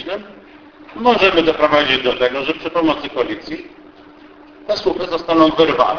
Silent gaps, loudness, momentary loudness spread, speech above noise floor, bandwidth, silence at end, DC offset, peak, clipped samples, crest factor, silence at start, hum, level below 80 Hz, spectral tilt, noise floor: none; -16 LUFS; 16 LU; 26 dB; 5.4 kHz; 0 s; under 0.1%; 0 dBFS; under 0.1%; 18 dB; 0 s; none; -46 dBFS; -5 dB/octave; -42 dBFS